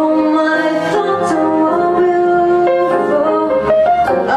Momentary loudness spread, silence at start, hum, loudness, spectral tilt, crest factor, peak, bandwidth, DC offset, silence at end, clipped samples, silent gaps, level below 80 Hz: 3 LU; 0 s; none; -13 LUFS; -6 dB/octave; 10 dB; -4 dBFS; 10.5 kHz; under 0.1%; 0 s; under 0.1%; none; -48 dBFS